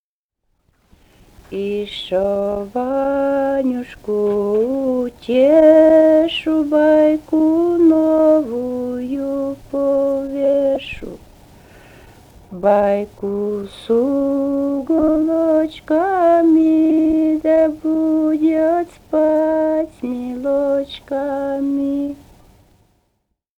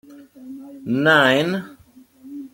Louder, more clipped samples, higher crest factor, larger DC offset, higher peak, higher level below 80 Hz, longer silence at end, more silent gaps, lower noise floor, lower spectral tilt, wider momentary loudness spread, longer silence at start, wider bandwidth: about the same, -16 LUFS vs -17 LUFS; neither; about the same, 16 dB vs 20 dB; neither; about the same, 0 dBFS vs -2 dBFS; first, -48 dBFS vs -64 dBFS; first, 1.45 s vs 0.05 s; neither; first, -74 dBFS vs -50 dBFS; first, -7 dB/octave vs -5 dB/octave; second, 11 LU vs 24 LU; first, 1.5 s vs 0.1 s; second, 8.2 kHz vs 17 kHz